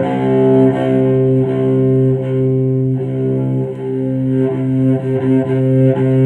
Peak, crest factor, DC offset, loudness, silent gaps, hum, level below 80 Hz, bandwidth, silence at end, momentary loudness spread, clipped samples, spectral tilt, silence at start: 0 dBFS; 12 dB; under 0.1%; -14 LUFS; none; none; -50 dBFS; 3.5 kHz; 0 s; 6 LU; under 0.1%; -10.5 dB/octave; 0 s